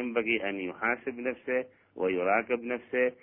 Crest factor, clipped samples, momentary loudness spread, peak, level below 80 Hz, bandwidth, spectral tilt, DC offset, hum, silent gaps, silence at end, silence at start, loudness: 20 dB; under 0.1%; 7 LU; -12 dBFS; -70 dBFS; 3.4 kHz; -8.5 dB/octave; under 0.1%; none; none; 0.1 s; 0 s; -30 LUFS